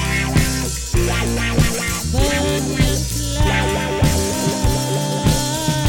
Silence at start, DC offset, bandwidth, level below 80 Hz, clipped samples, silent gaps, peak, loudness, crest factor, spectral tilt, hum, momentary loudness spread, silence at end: 0 s; under 0.1%; 17.5 kHz; -24 dBFS; under 0.1%; none; -2 dBFS; -18 LUFS; 16 dB; -4.5 dB/octave; none; 3 LU; 0 s